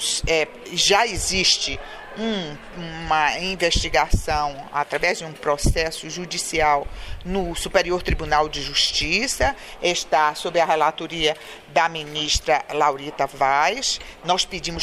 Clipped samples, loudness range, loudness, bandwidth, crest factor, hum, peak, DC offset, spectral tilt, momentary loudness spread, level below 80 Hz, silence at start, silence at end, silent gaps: under 0.1%; 2 LU; -21 LUFS; 15.5 kHz; 18 dB; none; -4 dBFS; under 0.1%; -2.5 dB/octave; 8 LU; -34 dBFS; 0 s; 0 s; none